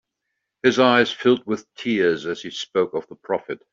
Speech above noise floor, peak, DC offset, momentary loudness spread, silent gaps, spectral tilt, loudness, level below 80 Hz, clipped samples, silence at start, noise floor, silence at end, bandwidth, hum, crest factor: 58 dB; -2 dBFS; under 0.1%; 12 LU; none; -4.5 dB/octave; -21 LUFS; -66 dBFS; under 0.1%; 0.65 s; -79 dBFS; 0.15 s; 7.6 kHz; none; 20 dB